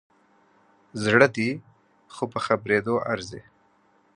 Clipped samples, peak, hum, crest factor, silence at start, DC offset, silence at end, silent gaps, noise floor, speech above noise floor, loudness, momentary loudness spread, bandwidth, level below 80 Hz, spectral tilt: under 0.1%; -2 dBFS; none; 26 dB; 0.95 s; under 0.1%; 0.75 s; none; -63 dBFS; 39 dB; -24 LUFS; 21 LU; 11 kHz; -62 dBFS; -5.5 dB/octave